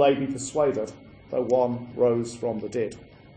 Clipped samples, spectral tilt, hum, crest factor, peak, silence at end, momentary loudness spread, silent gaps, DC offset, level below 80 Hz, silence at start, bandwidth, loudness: under 0.1%; -5.5 dB/octave; none; 18 dB; -8 dBFS; 0.3 s; 9 LU; none; under 0.1%; -58 dBFS; 0 s; 9.8 kHz; -26 LUFS